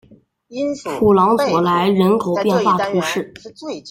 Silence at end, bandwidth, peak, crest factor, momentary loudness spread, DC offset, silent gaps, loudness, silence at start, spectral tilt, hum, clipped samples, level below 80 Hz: 0 s; 16 kHz; -2 dBFS; 14 dB; 16 LU; under 0.1%; none; -16 LUFS; 0.5 s; -6 dB/octave; none; under 0.1%; -54 dBFS